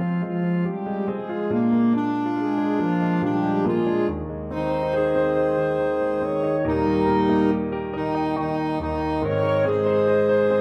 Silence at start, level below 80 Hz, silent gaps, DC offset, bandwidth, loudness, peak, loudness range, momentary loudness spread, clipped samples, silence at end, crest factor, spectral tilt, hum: 0 s; -44 dBFS; none; under 0.1%; 8.4 kHz; -23 LUFS; -8 dBFS; 1 LU; 7 LU; under 0.1%; 0 s; 14 dB; -9 dB/octave; none